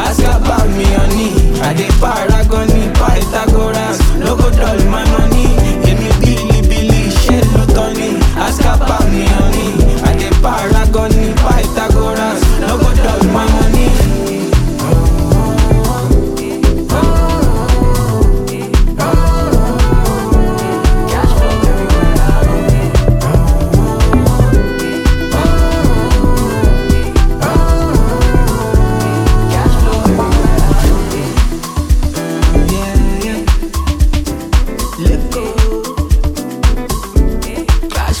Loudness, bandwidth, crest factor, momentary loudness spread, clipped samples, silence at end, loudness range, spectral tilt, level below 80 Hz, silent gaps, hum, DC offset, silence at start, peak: -13 LUFS; 16.5 kHz; 10 dB; 4 LU; under 0.1%; 0 s; 3 LU; -6 dB/octave; -12 dBFS; none; none; under 0.1%; 0 s; 0 dBFS